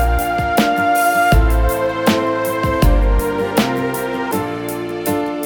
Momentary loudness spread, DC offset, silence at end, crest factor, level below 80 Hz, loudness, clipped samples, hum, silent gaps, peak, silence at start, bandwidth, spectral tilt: 7 LU; under 0.1%; 0 s; 16 dB; -20 dBFS; -17 LUFS; under 0.1%; none; none; 0 dBFS; 0 s; over 20 kHz; -5.5 dB/octave